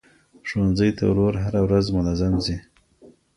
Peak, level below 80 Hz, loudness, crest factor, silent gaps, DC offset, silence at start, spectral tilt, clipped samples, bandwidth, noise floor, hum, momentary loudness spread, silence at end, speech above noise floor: -6 dBFS; -38 dBFS; -22 LUFS; 16 dB; none; under 0.1%; 0.45 s; -7.5 dB/octave; under 0.1%; 11 kHz; -52 dBFS; none; 9 LU; 0.3 s; 32 dB